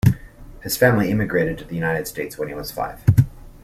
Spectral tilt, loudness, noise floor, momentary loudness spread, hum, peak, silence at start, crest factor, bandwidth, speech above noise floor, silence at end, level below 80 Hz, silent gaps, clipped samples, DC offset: -6.5 dB/octave; -21 LUFS; -40 dBFS; 12 LU; none; -2 dBFS; 0.05 s; 18 dB; 15.5 kHz; 19 dB; 0.05 s; -40 dBFS; none; under 0.1%; under 0.1%